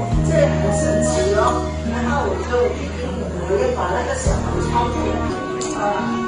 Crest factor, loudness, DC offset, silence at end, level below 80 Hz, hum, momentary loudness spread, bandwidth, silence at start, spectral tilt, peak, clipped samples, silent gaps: 16 dB; -20 LUFS; under 0.1%; 0 s; -28 dBFS; none; 7 LU; 10 kHz; 0 s; -6 dB/octave; -4 dBFS; under 0.1%; none